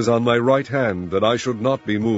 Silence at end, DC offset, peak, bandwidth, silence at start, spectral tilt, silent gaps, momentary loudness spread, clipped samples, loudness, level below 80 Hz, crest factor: 0 s; under 0.1%; -4 dBFS; 8 kHz; 0 s; -6 dB/octave; none; 4 LU; under 0.1%; -20 LUFS; -54 dBFS; 16 dB